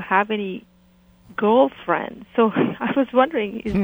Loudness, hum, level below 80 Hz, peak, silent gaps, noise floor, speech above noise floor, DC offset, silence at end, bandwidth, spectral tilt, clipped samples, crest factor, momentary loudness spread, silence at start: -21 LUFS; none; -50 dBFS; -2 dBFS; none; -54 dBFS; 34 dB; under 0.1%; 0 s; over 20 kHz; -8 dB/octave; under 0.1%; 18 dB; 9 LU; 0 s